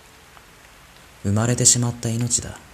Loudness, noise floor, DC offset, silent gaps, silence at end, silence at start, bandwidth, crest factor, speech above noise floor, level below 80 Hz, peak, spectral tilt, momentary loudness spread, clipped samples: -19 LUFS; -48 dBFS; under 0.1%; none; 0.15 s; 1.25 s; 14.5 kHz; 22 dB; 27 dB; -50 dBFS; 0 dBFS; -3.5 dB/octave; 10 LU; under 0.1%